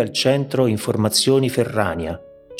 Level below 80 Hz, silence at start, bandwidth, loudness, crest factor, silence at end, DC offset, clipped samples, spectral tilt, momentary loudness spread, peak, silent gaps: -48 dBFS; 0 s; 16.5 kHz; -19 LUFS; 18 dB; 0 s; under 0.1%; under 0.1%; -4.5 dB/octave; 11 LU; -2 dBFS; none